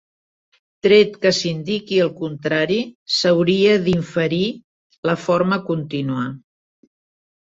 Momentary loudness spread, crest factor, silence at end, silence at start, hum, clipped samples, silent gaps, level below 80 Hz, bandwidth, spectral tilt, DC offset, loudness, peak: 10 LU; 18 dB; 1.15 s; 0.85 s; none; under 0.1%; 2.95-3.06 s, 4.64-4.90 s, 4.98-5.03 s; -56 dBFS; 8 kHz; -5.5 dB/octave; under 0.1%; -19 LUFS; -2 dBFS